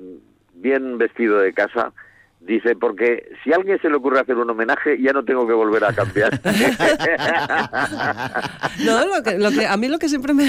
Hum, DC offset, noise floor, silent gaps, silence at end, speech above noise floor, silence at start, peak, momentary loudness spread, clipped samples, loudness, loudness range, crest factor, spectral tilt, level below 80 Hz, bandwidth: none; under 0.1%; -46 dBFS; none; 0 s; 27 dB; 0 s; -6 dBFS; 6 LU; under 0.1%; -19 LUFS; 2 LU; 12 dB; -5 dB/octave; -54 dBFS; 16 kHz